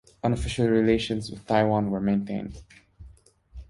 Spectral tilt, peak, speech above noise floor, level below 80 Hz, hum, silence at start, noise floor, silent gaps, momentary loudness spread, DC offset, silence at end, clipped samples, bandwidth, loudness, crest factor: -6.5 dB/octave; -8 dBFS; 28 dB; -44 dBFS; none; 0.25 s; -53 dBFS; none; 11 LU; under 0.1%; 0.05 s; under 0.1%; 11.5 kHz; -25 LUFS; 18 dB